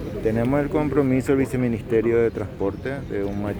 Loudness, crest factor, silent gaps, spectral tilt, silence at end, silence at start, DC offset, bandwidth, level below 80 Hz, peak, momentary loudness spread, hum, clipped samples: -23 LUFS; 14 dB; none; -8 dB/octave; 0 s; 0 s; under 0.1%; over 20 kHz; -40 dBFS; -8 dBFS; 7 LU; none; under 0.1%